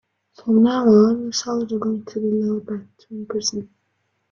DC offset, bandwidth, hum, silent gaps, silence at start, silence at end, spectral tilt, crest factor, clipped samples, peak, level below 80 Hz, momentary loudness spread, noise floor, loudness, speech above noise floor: under 0.1%; 7.4 kHz; none; none; 0.4 s; 0.65 s; -5.5 dB/octave; 16 dB; under 0.1%; -4 dBFS; -62 dBFS; 18 LU; -70 dBFS; -19 LUFS; 51 dB